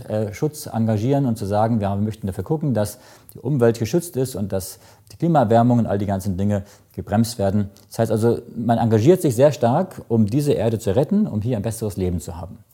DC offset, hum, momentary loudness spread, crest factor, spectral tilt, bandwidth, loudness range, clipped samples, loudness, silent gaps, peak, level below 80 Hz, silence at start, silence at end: under 0.1%; none; 11 LU; 18 dB; -7.5 dB/octave; 17 kHz; 4 LU; under 0.1%; -20 LUFS; none; -2 dBFS; -50 dBFS; 0 s; 0.15 s